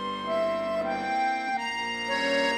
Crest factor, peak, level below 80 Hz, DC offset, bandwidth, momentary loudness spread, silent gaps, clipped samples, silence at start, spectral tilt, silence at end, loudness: 14 dB; -14 dBFS; -62 dBFS; under 0.1%; 13.5 kHz; 4 LU; none; under 0.1%; 0 s; -3.5 dB/octave; 0 s; -28 LUFS